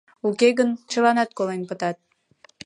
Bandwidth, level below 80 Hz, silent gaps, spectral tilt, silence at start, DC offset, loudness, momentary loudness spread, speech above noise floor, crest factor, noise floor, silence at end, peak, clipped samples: 11 kHz; -76 dBFS; none; -4.5 dB/octave; 0.25 s; under 0.1%; -22 LUFS; 10 LU; 36 dB; 18 dB; -57 dBFS; 0.7 s; -4 dBFS; under 0.1%